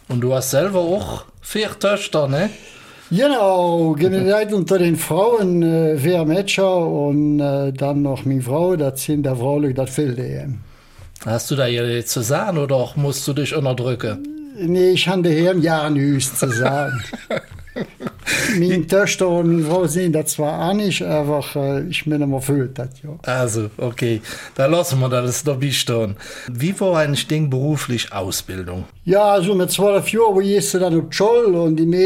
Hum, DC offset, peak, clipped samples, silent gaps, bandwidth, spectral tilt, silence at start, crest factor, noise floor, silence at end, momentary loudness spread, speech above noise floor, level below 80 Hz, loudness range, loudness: none; under 0.1%; -4 dBFS; under 0.1%; none; 16.5 kHz; -5.5 dB/octave; 0.1 s; 14 dB; -42 dBFS; 0 s; 10 LU; 24 dB; -48 dBFS; 4 LU; -18 LUFS